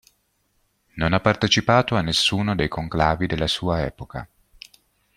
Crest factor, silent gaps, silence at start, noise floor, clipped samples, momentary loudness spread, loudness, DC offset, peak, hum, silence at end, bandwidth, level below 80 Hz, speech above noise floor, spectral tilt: 20 dB; none; 0.95 s; -68 dBFS; under 0.1%; 15 LU; -21 LUFS; under 0.1%; -2 dBFS; none; 0.9 s; 15 kHz; -42 dBFS; 47 dB; -4.5 dB/octave